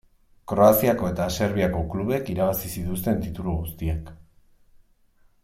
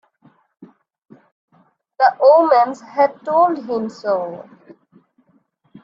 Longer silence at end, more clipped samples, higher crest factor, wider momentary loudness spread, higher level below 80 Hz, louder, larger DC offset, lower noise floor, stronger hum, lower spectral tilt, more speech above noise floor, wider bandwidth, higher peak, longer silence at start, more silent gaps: about the same, 1.3 s vs 1.4 s; neither; about the same, 20 dB vs 18 dB; about the same, 12 LU vs 12 LU; first, -42 dBFS vs -72 dBFS; second, -24 LUFS vs -16 LUFS; neither; about the same, -60 dBFS vs -60 dBFS; neither; about the same, -6.5 dB/octave vs -6 dB/octave; second, 37 dB vs 45 dB; first, 16.5 kHz vs 7.4 kHz; about the same, -4 dBFS vs -2 dBFS; second, 0.45 s vs 0.6 s; second, none vs 1.32-1.48 s